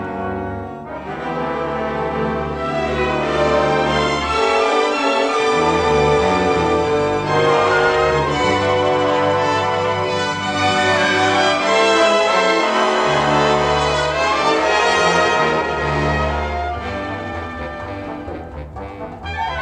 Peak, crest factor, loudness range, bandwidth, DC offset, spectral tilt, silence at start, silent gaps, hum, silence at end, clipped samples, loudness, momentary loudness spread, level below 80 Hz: -2 dBFS; 14 dB; 6 LU; 10.5 kHz; under 0.1%; -4.5 dB/octave; 0 s; none; none; 0 s; under 0.1%; -17 LUFS; 13 LU; -36 dBFS